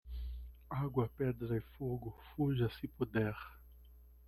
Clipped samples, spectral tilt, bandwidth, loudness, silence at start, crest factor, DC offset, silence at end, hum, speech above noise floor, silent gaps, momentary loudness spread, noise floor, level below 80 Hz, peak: under 0.1%; -9.5 dB/octave; 13.5 kHz; -39 LUFS; 0.05 s; 20 dB; under 0.1%; 0 s; none; 21 dB; none; 12 LU; -59 dBFS; -52 dBFS; -20 dBFS